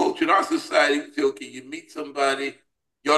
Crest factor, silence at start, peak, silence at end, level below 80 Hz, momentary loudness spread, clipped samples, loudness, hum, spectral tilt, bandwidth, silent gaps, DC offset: 18 dB; 0 s; -6 dBFS; 0 s; -74 dBFS; 16 LU; under 0.1%; -23 LUFS; none; -2.5 dB/octave; 12.5 kHz; none; under 0.1%